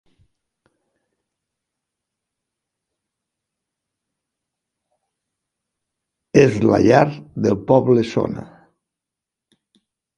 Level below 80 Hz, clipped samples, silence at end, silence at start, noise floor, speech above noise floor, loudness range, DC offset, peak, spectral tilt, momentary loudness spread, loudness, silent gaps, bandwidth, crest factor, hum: -52 dBFS; under 0.1%; 1.7 s; 6.35 s; -86 dBFS; 70 dB; 5 LU; under 0.1%; 0 dBFS; -7 dB/octave; 10 LU; -17 LUFS; none; 11 kHz; 22 dB; none